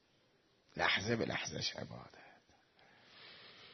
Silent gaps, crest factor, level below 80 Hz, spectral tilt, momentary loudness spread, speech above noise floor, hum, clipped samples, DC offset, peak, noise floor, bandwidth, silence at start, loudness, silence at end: none; 24 dB; -72 dBFS; -2 dB/octave; 22 LU; 35 dB; none; under 0.1%; under 0.1%; -18 dBFS; -73 dBFS; 6.2 kHz; 0.75 s; -37 LUFS; 0 s